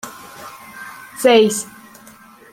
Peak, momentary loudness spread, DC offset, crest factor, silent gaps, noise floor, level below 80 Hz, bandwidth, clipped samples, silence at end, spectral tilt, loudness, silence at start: -2 dBFS; 23 LU; under 0.1%; 18 dB; none; -44 dBFS; -64 dBFS; 16.5 kHz; under 0.1%; 0.9 s; -3 dB/octave; -15 LUFS; 0.05 s